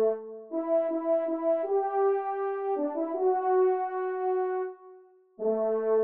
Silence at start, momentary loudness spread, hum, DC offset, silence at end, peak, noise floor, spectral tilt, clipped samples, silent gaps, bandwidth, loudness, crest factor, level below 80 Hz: 0 s; 8 LU; none; under 0.1%; 0 s; -16 dBFS; -54 dBFS; -6 dB/octave; under 0.1%; none; 3.2 kHz; -29 LUFS; 12 dB; -84 dBFS